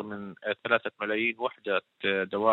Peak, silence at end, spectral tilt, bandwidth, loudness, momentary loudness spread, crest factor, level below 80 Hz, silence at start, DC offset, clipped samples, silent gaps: -8 dBFS; 0 s; -7 dB/octave; 4.2 kHz; -29 LUFS; 7 LU; 20 dB; -76 dBFS; 0 s; under 0.1%; under 0.1%; none